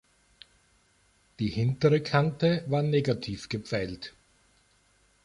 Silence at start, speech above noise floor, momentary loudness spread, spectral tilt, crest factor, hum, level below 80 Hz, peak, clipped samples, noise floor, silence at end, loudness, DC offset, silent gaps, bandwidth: 1.4 s; 39 dB; 11 LU; -7 dB/octave; 20 dB; 50 Hz at -50 dBFS; -56 dBFS; -10 dBFS; under 0.1%; -66 dBFS; 1.15 s; -28 LUFS; under 0.1%; none; 11 kHz